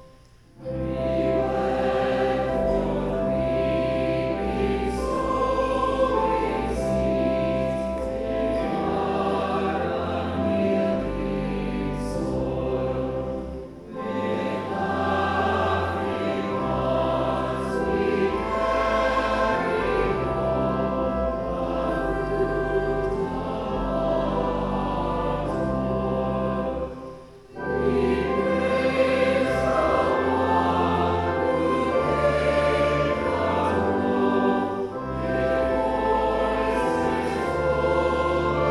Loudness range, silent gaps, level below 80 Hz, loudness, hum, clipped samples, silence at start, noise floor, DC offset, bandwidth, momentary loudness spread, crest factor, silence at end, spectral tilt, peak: 4 LU; none; -38 dBFS; -24 LUFS; none; under 0.1%; 0 s; -51 dBFS; under 0.1%; 12 kHz; 6 LU; 14 dB; 0 s; -7 dB/octave; -10 dBFS